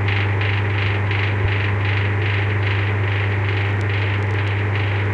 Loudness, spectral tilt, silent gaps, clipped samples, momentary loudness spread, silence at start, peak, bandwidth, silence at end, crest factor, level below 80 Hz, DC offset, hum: -20 LUFS; -7.5 dB/octave; none; under 0.1%; 1 LU; 0 s; -6 dBFS; 5.4 kHz; 0 s; 12 dB; -40 dBFS; under 0.1%; none